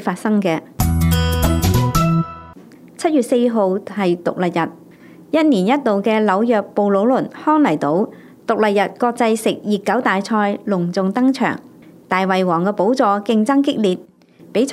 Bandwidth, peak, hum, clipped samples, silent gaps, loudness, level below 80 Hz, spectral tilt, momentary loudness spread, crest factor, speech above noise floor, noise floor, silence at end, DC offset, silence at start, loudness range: 16 kHz; 0 dBFS; none; under 0.1%; none; -17 LUFS; -36 dBFS; -6.5 dB/octave; 6 LU; 16 dB; 26 dB; -42 dBFS; 0 s; under 0.1%; 0 s; 2 LU